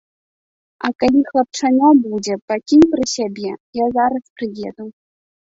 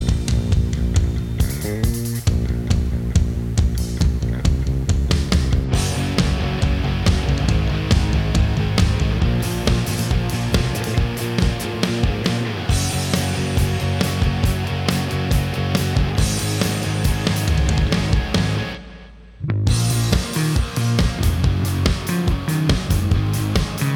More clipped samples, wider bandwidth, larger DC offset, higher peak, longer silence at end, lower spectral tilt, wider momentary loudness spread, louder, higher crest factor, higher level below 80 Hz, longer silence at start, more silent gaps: neither; second, 8 kHz vs 19 kHz; neither; about the same, 0 dBFS vs -2 dBFS; first, 0.6 s vs 0 s; about the same, -4.5 dB/octave vs -5.5 dB/octave; first, 15 LU vs 3 LU; first, -17 LUFS vs -20 LUFS; about the same, 16 dB vs 18 dB; second, -52 dBFS vs -24 dBFS; first, 0.85 s vs 0 s; first, 2.42-2.48 s, 3.60-3.73 s, 4.30-4.36 s vs none